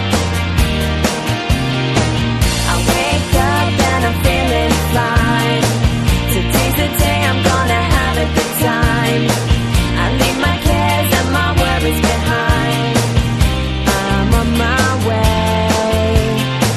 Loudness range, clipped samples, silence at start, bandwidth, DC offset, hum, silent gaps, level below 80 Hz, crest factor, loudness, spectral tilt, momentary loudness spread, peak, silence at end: 1 LU; under 0.1%; 0 s; 13.5 kHz; under 0.1%; none; none; -22 dBFS; 14 dB; -14 LUFS; -5 dB/octave; 2 LU; 0 dBFS; 0 s